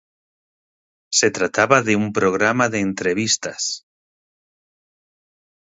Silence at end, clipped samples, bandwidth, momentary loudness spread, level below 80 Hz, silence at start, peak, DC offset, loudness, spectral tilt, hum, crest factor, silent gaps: 2 s; under 0.1%; 8 kHz; 9 LU; -58 dBFS; 1.1 s; 0 dBFS; under 0.1%; -18 LUFS; -3 dB/octave; none; 22 dB; none